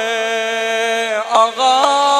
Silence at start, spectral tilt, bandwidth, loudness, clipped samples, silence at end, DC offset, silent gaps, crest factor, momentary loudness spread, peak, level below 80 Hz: 0 s; 0 dB/octave; 14 kHz; -15 LUFS; under 0.1%; 0 s; under 0.1%; none; 14 dB; 5 LU; 0 dBFS; -70 dBFS